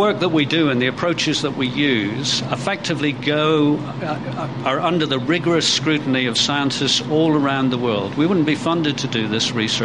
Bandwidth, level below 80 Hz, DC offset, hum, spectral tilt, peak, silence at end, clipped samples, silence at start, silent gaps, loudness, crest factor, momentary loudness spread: 11 kHz; -54 dBFS; 0.3%; none; -4.5 dB/octave; -4 dBFS; 0 s; under 0.1%; 0 s; none; -19 LUFS; 14 dB; 5 LU